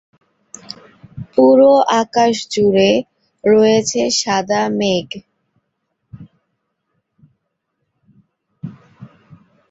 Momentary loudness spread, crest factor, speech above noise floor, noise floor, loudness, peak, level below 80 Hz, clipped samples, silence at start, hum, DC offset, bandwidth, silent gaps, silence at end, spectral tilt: 24 LU; 16 dB; 59 dB; -72 dBFS; -14 LUFS; -2 dBFS; -56 dBFS; under 0.1%; 0.7 s; none; under 0.1%; 8 kHz; none; 0.65 s; -4 dB/octave